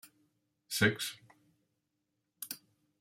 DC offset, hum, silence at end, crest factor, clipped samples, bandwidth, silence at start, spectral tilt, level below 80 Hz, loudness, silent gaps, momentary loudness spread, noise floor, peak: under 0.1%; none; 0.45 s; 26 dB; under 0.1%; 16.5 kHz; 0.7 s; -3.5 dB/octave; -76 dBFS; -34 LUFS; none; 18 LU; -84 dBFS; -14 dBFS